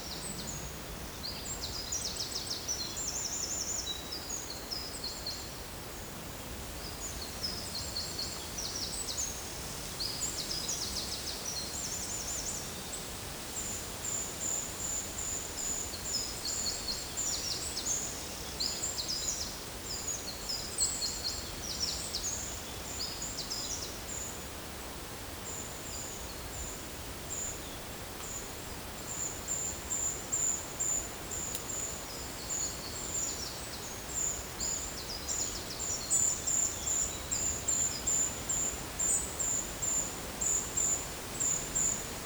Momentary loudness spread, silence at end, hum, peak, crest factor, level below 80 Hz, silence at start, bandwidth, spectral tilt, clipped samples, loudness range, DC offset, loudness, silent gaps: 10 LU; 0 s; none; -16 dBFS; 20 dB; -50 dBFS; 0 s; over 20 kHz; -1 dB/octave; under 0.1%; 8 LU; under 0.1%; -34 LUFS; none